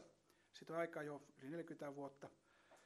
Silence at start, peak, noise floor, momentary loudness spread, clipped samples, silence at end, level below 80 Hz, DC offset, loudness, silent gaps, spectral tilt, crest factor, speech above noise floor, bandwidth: 0 s; -32 dBFS; -74 dBFS; 16 LU; under 0.1%; 0 s; under -90 dBFS; under 0.1%; -50 LUFS; none; -6 dB/octave; 20 dB; 24 dB; 13 kHz